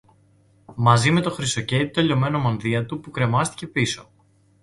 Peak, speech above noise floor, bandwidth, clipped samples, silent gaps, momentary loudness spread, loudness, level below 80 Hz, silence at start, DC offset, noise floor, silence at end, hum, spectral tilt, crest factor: -2 dBFS; 36 dB; 11.5 kHz; under 0.1%; none; 8 LU; -21 LUFS; -52 dBFS; 0.7 s; under 0.1%; -57 dBFS; 0.6 s; none; -5 dB/octave; 20 dB